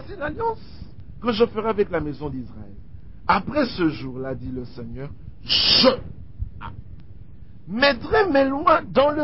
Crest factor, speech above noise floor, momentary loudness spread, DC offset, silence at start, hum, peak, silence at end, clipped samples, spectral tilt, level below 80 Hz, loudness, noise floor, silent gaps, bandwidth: 20 dB; 22 dB; 21 LU; 1%; 0 s; none; -4 dBFS; 0 s; under 0.1%; -8 dB/octave; -42 dBFS; -21 LUFS; -44 dBFS; none; 5.8 kHz